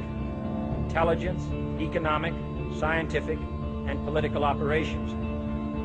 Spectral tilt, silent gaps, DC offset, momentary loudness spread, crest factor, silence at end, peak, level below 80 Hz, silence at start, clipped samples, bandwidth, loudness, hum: -7.5 dB/octave; none; under 0.1%; 7 LU; 16 dB; 0 s; -12 dBFS; -38 dBFS; 0 s; under 0.1%; 8.8 kHz; -29 LUFS; none